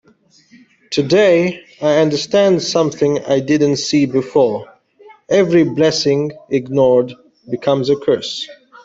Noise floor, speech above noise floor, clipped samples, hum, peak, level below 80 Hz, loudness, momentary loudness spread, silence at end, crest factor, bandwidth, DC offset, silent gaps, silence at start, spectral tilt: -52 dBFS; 38 dB; under 0.1%; none; -2 dBFS; -56 dBFS; -15 LUFS; 9 LU; 0.3 s; 14 dB; 8 kHz; under 0.1%; none; 0.9 s; -5.5 dB/octave